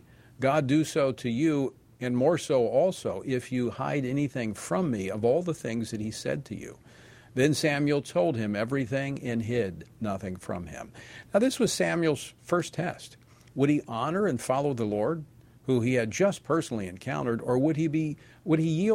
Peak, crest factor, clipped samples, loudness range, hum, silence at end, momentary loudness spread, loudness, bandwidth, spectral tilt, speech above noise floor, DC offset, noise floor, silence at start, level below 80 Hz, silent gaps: -10 dBFS; 18 dB; under 0.1%; 3 LU; none; 0 s; 11 LU; -28 LUFS; 16 kHz; -6 dB/octave; 25 dB; under 0.1%; -52 dBFS; 0.4 s; -60 dBFS; none